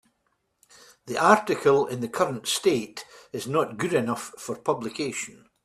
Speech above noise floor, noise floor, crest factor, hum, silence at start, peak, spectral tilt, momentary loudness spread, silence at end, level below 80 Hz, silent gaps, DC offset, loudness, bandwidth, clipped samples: 48 dB; -73 dBFS; 24 dB; none; 1.05 s; -2 dBFS; -4 dB/octave; 15 LU; 0.3 s; -66 dBFS; none; under 0.1%; -25 LUFS; 14.5 kHz; under 0.1%